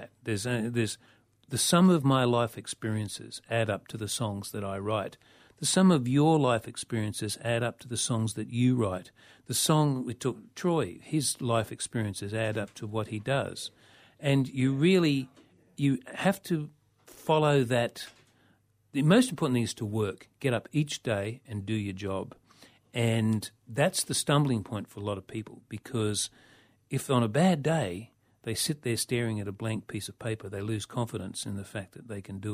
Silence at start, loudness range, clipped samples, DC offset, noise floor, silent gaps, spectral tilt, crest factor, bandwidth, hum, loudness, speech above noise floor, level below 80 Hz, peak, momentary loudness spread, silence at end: 0 s; 5 LU; under 0.1%; under 0.1%; -67 dBFS; none; -5 dB/octave; 20 dB; 15.5 kHz; none; -29 LUFS; 38 dB; -64 dBFS; -10 dBFS; 14 LU; 0 s